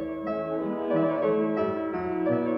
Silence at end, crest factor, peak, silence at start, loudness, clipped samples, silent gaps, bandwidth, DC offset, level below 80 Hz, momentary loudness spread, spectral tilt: 0 s; 12 dB; -14 dBFS; 0 s; -27 LUFS; under 0.1%; none; 5.6 kHz; under 0.1%; -60 dBFS; 5 LU; -10 dB/octave